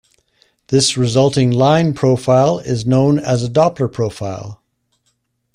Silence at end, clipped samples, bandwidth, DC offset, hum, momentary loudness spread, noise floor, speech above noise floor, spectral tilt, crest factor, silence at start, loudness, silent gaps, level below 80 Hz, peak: 1 s; under 0.1%; 11 kHz; under 0.1%; none; 9 LU; -66 dBFS; 52 dB; -6 dB/octave; 14 dB; 0.7 s; -15 LUFS; none; -48 dBFS; -2 dBFS